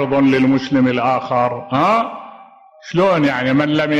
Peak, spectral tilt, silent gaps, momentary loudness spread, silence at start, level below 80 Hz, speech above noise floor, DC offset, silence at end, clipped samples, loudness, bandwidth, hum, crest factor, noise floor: -4 dBFS; -7 dB/octave; none; 5 LU; 0 s; -54 dBFS; 28 dB; under 0.1%; 0 s; under 0.1%; -16 LUFS; 7.8 kHz; none; 12 dB; -43 dBFS